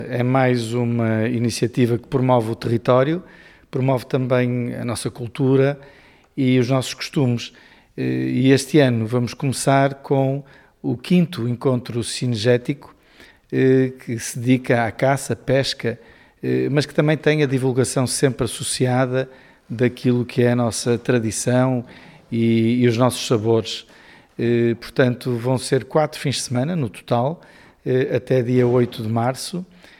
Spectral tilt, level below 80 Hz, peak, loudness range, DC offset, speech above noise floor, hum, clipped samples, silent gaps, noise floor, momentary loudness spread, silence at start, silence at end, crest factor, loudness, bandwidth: -6 dB/octave; -54 dBFS; -2 dBFS; 2 LU; under 0.1%; 30 dB; none; under 0.1%; none; -49 dBFS; 10 LU; 0 s; 0.35 s; 18 dB; -20 LUFS; 15.5 kHz